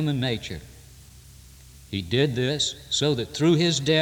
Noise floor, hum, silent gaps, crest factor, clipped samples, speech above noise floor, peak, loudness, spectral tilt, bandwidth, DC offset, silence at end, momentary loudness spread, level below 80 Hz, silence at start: -48 dBFS; none; none; 18 dB; under 0.1%; 24 dB; -8 dBFS; -24 LUFS; -4.5 dB/octave; 19.5 kHz; under 0.1%; 0 s; 13 LU; -52 dBFS; 0 s